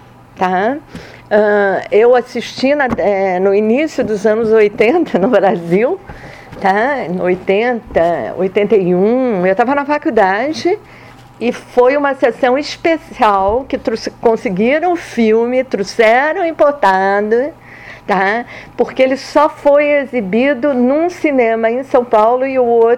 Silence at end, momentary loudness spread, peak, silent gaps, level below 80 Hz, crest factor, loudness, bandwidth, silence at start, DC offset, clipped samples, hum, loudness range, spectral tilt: 0 s; 8 LU; 0 dBFS; none; -46 dBFS; 12 dB; -13 LUFS; 11.5 kHz; 0.35 s; under 0.1%; under 0.1%; none; 2 LU; -6 dB/octave